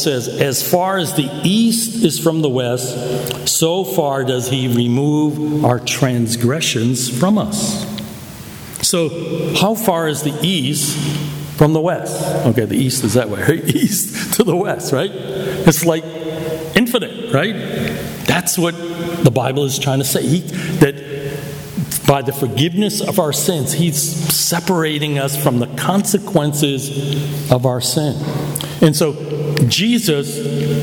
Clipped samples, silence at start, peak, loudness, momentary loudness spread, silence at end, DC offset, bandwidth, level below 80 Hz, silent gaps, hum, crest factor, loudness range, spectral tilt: under 0.1%; 0 s; 0 dBFS; -16 LUFS; 7 LU; 0 s; under 0.1%; over 20 kHz; -46 dBFS; none; none; 16 dB; 2 LU; -4.5 dB/octave